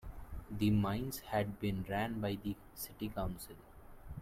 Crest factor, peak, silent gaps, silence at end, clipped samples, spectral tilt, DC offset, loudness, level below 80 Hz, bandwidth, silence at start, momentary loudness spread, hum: 16 dB; -22 dBFS; none; 0 s; under 0.1%; -6.5 dB/octave; under 0.1%; -38 LUFS; -52 dBFS; 16.5 kHz; 0 s; 18 LU; none